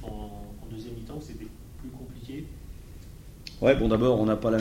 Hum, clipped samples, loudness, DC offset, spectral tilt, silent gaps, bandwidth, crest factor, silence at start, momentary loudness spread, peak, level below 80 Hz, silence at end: none; under 0.1%; -25 LUFS; under 0.1%; -7.5 dB/octave; none; 16 kHz; 22 dB; 0 s; 23 LU; -6 dBFS; -42 dBFS; 0 s